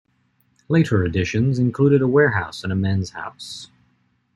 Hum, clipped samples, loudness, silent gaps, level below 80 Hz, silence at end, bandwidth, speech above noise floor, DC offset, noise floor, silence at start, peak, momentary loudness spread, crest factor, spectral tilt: none; under 0.1%; -19 LUFS; none; -50 dBFS; 0.7 s; 11.5 kHz; 45 dB; under 0.1%; -64 dBFS; 0.7 s; -4 dBFS; 16 LU; 16 dB; -7 dB/octave